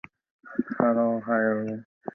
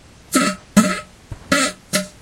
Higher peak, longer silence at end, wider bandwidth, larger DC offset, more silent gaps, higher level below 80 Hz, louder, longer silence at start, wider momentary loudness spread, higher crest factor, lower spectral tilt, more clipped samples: second, -6 dBFS vs 0 dBFS; about the same, 0.05 s vs 0.15 s; second, 3 kHz vs 16.5 kHz; neither; first, 1.85-2.01 s vs none; second, -70 dBFS vs -48 dBFS; second, -26 LUFS vs -19 LUFS; first, 0.45 s vs 0.3 s; about the same, 11 LU vs 13 LU; about the same, 22 dB vs 20 dB; first, -10.5 dB/octave vs -3.5 dB/octave; neither